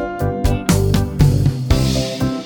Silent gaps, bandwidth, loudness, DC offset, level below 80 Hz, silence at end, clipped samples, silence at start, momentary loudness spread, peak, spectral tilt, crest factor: none; over 20 kHz; -17 LUFS; under 0.1%; -24 dBFS; 0 s; under 0.1%; 0 s; 5 LU; 0 dBFS; -6 dB/octave; 16 dB